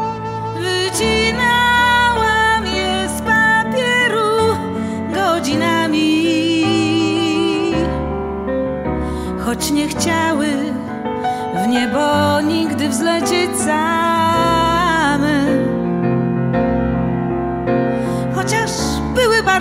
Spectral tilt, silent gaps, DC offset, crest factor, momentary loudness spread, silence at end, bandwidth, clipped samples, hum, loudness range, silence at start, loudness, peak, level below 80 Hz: -4.5 dB/octave; none; under 0.1%; 14 dB; 8 LU; 0 s; 16 kHz; under 0.1%; none; 5 LU; 0 s; -16 LUFS; -2 dBFS; -34 dBFS